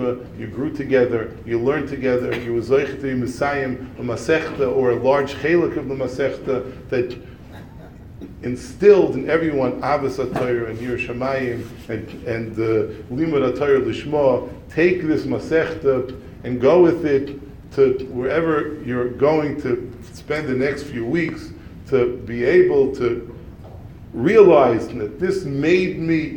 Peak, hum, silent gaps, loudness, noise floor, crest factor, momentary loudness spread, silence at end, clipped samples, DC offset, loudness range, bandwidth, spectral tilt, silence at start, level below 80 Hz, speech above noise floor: 0 dBFS; none; none; -20 LUFS; -39 dBFS; 18 dB; 15 LU; 0 s; under 0.1%; under 0.1%; 5 LU; 10 kHz; -7 dB/octave; 0 s; -44 dBFS; 20 dB